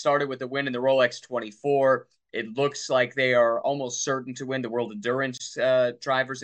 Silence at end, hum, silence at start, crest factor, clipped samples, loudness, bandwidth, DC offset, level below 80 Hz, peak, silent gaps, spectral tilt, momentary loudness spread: 0 s; none; 0 s; 16 dB; under 0.1%; -25 LUFS; 8.8 kHz; under 0.1%; -76 dBFS; -8 dBFS; none; -4 dB/octave; 9 LU